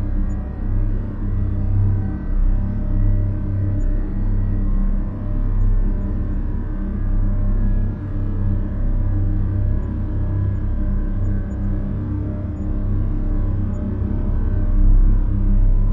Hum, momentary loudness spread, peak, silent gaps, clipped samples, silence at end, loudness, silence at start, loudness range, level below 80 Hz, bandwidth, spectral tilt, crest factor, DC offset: none; 5 LU; -6 dBFS; none; under 0.1%; 0 s; -23 LUFS; 0 s; 2 LU; -20 dBFS; 2.1 kHz; -11.5 dB/octave; 12 dB; under 0.1%